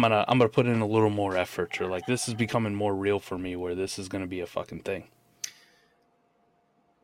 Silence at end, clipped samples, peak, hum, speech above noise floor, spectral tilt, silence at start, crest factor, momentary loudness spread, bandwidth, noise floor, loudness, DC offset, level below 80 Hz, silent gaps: 1.55 s; under 0.1%; -8 dBFS; none; 41 dB; -5.5 dB/octave; 0 s; 20 dB; 13 LU; 16.5 kHz; -68 dBFS; -28 LUFS; under 0.1%; -62 dBFS; none